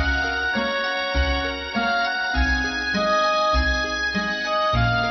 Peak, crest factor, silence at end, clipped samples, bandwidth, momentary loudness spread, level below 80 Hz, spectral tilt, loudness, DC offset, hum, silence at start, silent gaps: -10 dBFS; 12 dB; 0 s; under 0.1%; 6.2 kHz; 4 LU; -30 dBFS; -4.5 dB/octave; -22 LUFS; under 0.1%; none; 0 s; none